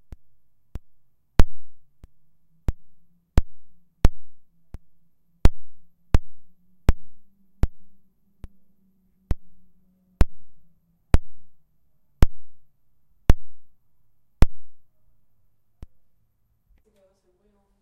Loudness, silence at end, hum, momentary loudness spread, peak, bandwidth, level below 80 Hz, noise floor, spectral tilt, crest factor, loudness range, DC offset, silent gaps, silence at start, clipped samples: -28 LUFS; 3.05 s; none; 23 LU; 0 dBFS; 8.6 kHz; -28 dBFS; -69 dBFS; -7 dB/octave; 22 dB; 5 LU; under 0.1%; none; 0.75 s; under 0.1%